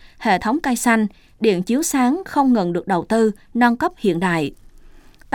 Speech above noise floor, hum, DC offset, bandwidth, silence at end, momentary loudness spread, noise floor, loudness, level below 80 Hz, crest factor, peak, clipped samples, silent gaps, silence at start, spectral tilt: 26 dB; none; under 0.1%; 18.5 kHz; 0.35 s; 4 LU; -44 dBFS; -19 LUFS; -48 dBFS; 16 dB; -4 dBFS; under 0.1%; none; 0.2 s; -5 dB/octave